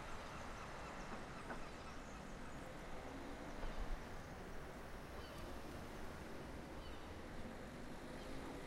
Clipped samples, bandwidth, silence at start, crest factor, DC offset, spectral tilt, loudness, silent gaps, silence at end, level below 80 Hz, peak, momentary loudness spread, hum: under 0.1%; 16 kHz; 0 s; 16 dB; under 0.1%; -5 dB/octave; -52 LUFS; none; 0 s; -54 dBFS; -32 dBFS; 2 LU; none